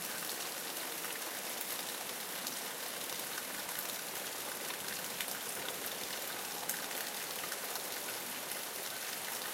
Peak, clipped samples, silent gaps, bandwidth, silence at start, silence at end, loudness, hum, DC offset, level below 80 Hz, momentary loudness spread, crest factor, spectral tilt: -14 dBFS; under 0.1%; none; 17 kHz; 0 s; 0 s; -38 LUFS; none; under 0.1%; -82 dBFS; 1 LU; 26 dB; 0 dB/octave